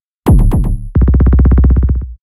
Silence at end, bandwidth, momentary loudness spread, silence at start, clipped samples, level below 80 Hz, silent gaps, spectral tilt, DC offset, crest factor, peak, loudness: 0.1 s; 12 kHz; 7 LU; 0.25 s; under 0.1%; -10 dBFS; none; -9.5 dB/octave; under 0.1%; 8 dB; 0 dBFS; -11 LUFS